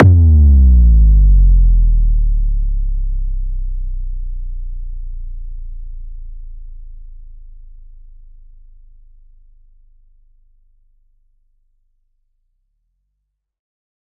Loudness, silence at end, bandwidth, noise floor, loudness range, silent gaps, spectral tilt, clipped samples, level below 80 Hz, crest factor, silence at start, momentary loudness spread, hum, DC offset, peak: -14 LUFS; 6.35 s; 1.1 kHz; -73 dBFS; 26 LU; none; -12.5 dB/octave; under 0.1%; -16 dBFS; 14 dB; 0 s; 26 LU; none; under 0.1%; 0 dBFS